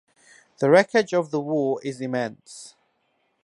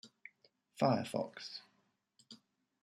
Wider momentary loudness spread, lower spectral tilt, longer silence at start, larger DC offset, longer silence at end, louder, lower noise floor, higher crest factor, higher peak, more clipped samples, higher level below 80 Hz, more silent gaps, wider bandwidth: second, 22 LU vs 25 LU; about the same, -5.5 dB/octave vs -6 dB/octave; first, 0.6 s vs 0.05 s; neither; first, 0.75 s vs 0.5 s; first, -22 LUFS vs -37 LUFS; second, -70 dBFS vs -78 dBFS; about the same, 22 dB vs 22 dB; first, -4 dBFS vs -18 dBFS; neither; first, -76 dBFS vs -82 dBFS; neither; second, 11.5 kHz vs 13.5 kHz